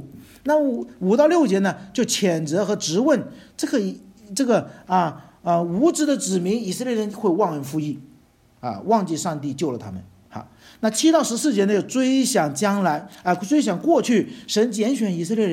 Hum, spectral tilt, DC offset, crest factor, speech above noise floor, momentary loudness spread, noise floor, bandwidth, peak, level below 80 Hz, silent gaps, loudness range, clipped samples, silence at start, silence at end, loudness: none; -5 dB/octave; under 0.1%; 18 dB; 34 dB; 13 LU; -55 dBFS; 16.5 kHz; -4 dBFS; -64 dBFS; none; 4 LU; under 0.1%; 0 s; 0 s; -21 LUFS